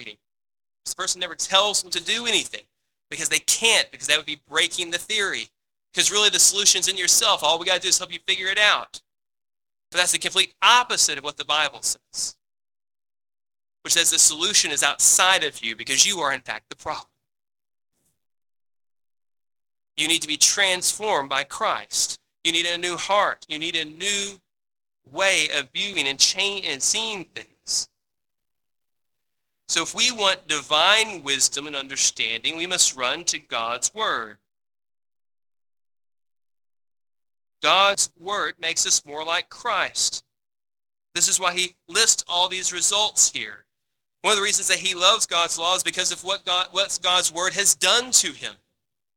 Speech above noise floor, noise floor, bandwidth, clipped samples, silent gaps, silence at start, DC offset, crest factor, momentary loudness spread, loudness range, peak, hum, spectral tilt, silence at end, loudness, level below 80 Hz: 63 dB; -86 dBFS; 20 kHz; under 0.1%; none; 0 s; under 0.1%; 22 dB; 12 LU; 7 LU; -2 dBFS; none; 1 dB/octave; 0.6 s; -20 LUFS; -66 dBFS